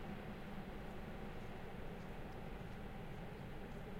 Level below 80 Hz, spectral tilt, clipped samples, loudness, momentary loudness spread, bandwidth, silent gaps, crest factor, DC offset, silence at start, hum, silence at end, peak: -54 dBFS; -7 dB/octave; under 0.1%; -51 LUFS; 1 LU; 16 kHz; none; 12 dB; under 0.1%; 0 s; none; 0 s; -36 dBFS